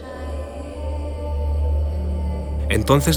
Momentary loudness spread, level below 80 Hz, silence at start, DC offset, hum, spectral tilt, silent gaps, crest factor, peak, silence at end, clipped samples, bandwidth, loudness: 12 LU; -24 dBFS; 0 s; under 0.1%; none; -5.5 dB/octave; none; 20 dB; -2 dBFS; 0 s; under 0.1%; 18 kHz; -24 LUFS